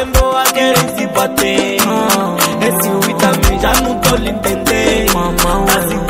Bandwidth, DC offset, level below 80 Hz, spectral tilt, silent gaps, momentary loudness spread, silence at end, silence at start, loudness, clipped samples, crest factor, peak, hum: over 20 kHz; 0.2%; -22 dBFS; -3.5 dB/octave; none; 3 LU; 0 s; 0 s; -12 LUFS; under 0.1%; 12 dB; 0 dBFS; none